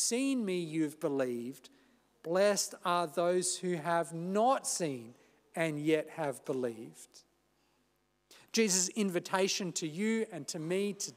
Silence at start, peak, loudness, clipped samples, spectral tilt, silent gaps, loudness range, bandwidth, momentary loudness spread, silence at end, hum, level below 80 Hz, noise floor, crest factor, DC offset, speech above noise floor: 0 s; -16 dBFS; -33 LUFS; under 0.1%; -3.5 dB/octave; none; 5 LU; 16 kHz; 10 LU; 0.05 s; 50 Hz at -65 dBFS; -86 dBFS; -75 dBFS; 18 dB; under 0.1%; 42 dB